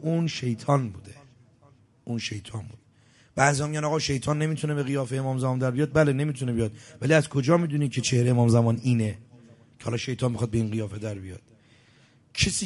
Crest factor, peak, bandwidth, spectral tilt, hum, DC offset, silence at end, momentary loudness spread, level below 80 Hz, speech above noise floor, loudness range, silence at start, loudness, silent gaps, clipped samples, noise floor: 22 dB; -4 dBFS; 11.5 kHz; -5.5 dB/octave; none; under 0.1%; 0 s; 14 LU; -50 dBFS; 34 dB; 7 LU; 0 s; -26 LUFS; none; under 0.1%; -59 dBFS